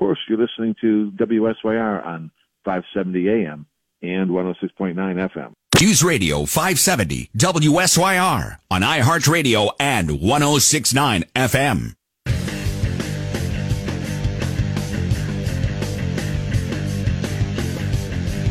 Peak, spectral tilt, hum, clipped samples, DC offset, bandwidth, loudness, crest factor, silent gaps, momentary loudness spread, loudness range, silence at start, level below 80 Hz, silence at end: 0 dBFS; -4 dB/octave; none; under 0.1%; under 0.1%; 16.5 kHz; -19 LUFS; 18 dB; none; 11 LU; 7 LU; 0 s; -34 dBFS; 0 s